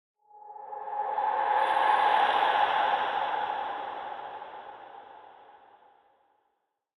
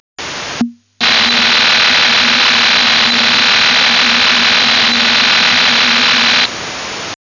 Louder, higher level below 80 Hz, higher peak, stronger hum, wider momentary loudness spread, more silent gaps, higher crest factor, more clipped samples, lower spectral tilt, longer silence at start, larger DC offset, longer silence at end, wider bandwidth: second, -27 LUFS vs -8 LUFS; second, -76 dBFS vs -48 dBFS; second, -12 dBFS vs -4 dBFS; neither; first, 22 LU vs 13 LU; neither; first, 18 dB vs 8 dB; neither; first, -2.5 dB/octave vs -0.5 dB/octave; first, 0.35 s vs 0.2 s; neither; first, 1.65 s vs 0.15 s; first, 10.5 kHz vs 7.4 kHz